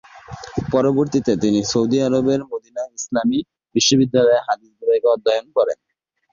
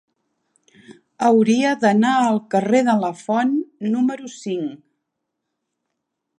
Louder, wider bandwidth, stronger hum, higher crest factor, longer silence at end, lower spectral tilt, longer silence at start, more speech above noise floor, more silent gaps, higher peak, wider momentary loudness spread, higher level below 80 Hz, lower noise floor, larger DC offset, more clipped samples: about the same, -19 LUFS vs -19 LUFS; second, 7.4 kHz vs 10 kHz; neither; about the same, 16 dB vs 18 dB; second, 0.6 s vs 1.65 s; about the same, -4.5 dB/octave vs -5.5 dB/octave; second, 0.15 s vs 0.9 s; second, 19 dB vs 60 dB; neither; about the same, -4 dBFS vs -2 dBFS; about the same, 13 LU vs 11 LU; first, -52 dBFS vs -74 dBFS; second, -37 dBFS vs -78 dBFS; neither; neither